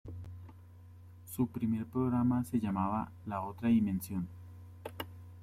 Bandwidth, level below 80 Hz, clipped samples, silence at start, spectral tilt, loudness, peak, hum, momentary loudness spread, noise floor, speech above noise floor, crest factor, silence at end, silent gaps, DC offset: 15.5 kHz; -62 dBFS; under 0.1%; 0.05 s; -7.5 dB/octave; -34 LUFS; -20 dBFS; none; 22 LU; -54 dBFS; 21 dB; 16 dB; 0 s; none; under 0.1%